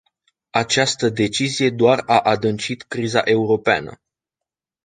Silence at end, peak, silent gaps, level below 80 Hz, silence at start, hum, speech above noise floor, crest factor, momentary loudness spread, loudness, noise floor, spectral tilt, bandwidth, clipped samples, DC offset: 0.9 s; -2 dBFS; none; -56 dBFS; 0.55 s; none; 68 dB; 18 dB; 8 LU; -18 LUFS; -86 dBFS; -4 dB/octave; 9.6 kHz; under 0.1%; under 0.1%